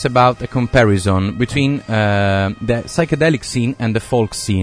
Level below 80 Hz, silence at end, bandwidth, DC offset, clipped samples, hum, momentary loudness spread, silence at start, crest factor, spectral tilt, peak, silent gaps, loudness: -38 dBFS; 0 s; 11 kHz; under 0.1%; under 0.1%; none; 5 LU; 0 s; 16 dB; -6 dB/octave; 0 dBFS; none; -16 LUFS